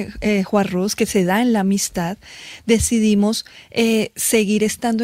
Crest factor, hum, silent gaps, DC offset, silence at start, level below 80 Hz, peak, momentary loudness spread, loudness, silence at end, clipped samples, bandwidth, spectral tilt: 16 dB; none; none; under 0.1%; 0 s; -42 dBFS; -4 dBFS; 10 LU; -18 LUFS; 0 s; under 0.1%; 16 kHz; -4.5 dB/octave